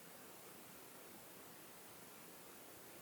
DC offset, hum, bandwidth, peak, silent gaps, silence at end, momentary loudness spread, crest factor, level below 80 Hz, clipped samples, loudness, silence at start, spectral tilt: under 0.1%; none; over 20 kHz; -44 dBFS; none; 0 s; 0 LU; 14 dB; -88 dBFS; under 0.1%; -56 LUFS; 0 s; -2.5 dB/octave